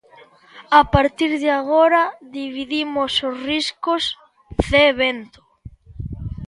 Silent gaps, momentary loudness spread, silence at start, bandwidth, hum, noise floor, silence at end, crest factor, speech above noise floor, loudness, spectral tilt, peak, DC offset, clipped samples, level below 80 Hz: none; 16 LU; 0.55 s; 11.5 kHz; none; -48 dBFS; 0 s; 20 dB; 30 dB; -18 LUFS; -5 dB/octave; 0 dBFS; under 0.1%; under 0.1%; -38 dBFS